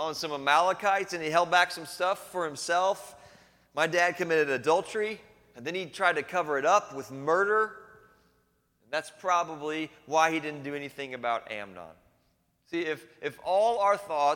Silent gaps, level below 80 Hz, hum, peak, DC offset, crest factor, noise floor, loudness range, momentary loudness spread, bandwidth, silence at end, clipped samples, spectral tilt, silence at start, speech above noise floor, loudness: none; -72 dBFS; none; -8 dBFS; under 0.1%; 22 dB; -71 dBFS; 5 LU; 13 LU; 17.5 kHz; 0 s; under 0.1%; -3 dB/octave; 0 s; 43 dB; -28 LUFS